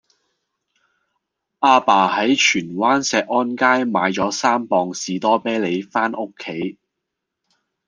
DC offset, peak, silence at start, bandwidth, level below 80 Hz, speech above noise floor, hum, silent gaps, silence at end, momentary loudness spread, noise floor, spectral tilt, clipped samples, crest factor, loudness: under 0.1%; 0 dBFS; 1.6 s; 10 kHz; -64 dBFS; 62 dB; none; none; 1.15 s; 11 LU; -80 dBFS; -3.5 dB/octave; under 0.1%; 18 dB; -18 LUFS